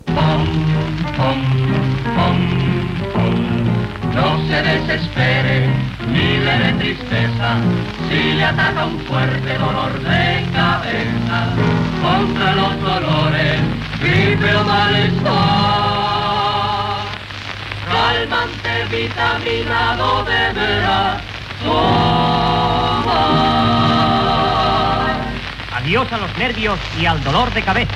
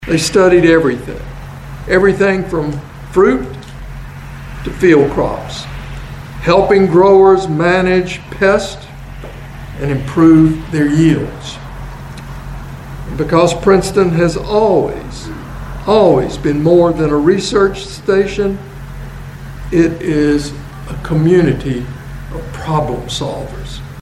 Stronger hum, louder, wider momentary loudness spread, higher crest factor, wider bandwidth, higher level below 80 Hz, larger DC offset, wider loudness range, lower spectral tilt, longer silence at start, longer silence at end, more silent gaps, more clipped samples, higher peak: neither; second, -16 LUFS vs -12 LUFS; second, 6 LU vs 20 LU; about the same, 14 dB vs 14 dB; second, 11 kHz vs 13.5 kHz; about the same, -34 dBFS vs -30 dBFS; neither; second, 2 LU vs 5 LU; about the same, -6.5 dB/octave vs -6.5 dB/octave; about the same, 0.05 s vs 0 s; about the same, 0 s vs 0 s; neither; neither; about the same, -2 dBFS vs 0 dBFS